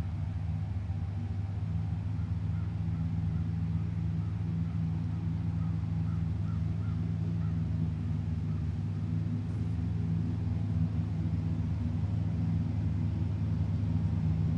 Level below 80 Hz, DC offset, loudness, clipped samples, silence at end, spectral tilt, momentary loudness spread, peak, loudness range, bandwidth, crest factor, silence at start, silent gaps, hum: -46 dBFS; under 0.1%; -33 LUFS; under 0.1%; 0 s; -9.5 dB/octave; 3 LU; -20 dBFS; 2 LU; 5.8 kHz; 12 dB; 0 s; none; none